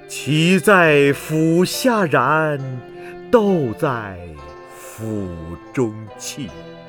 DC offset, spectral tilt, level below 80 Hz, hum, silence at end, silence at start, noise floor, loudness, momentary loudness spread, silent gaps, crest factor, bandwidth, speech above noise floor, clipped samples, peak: under 0.1%; -5.5 dB/octave; -50 dBFS; none; 0 s; 0 s; -37 dBFS; -17 LUFS; 22 LU; none; 18 dB; 20 kHz; 19 dB; under 0.1%; 0 dBFS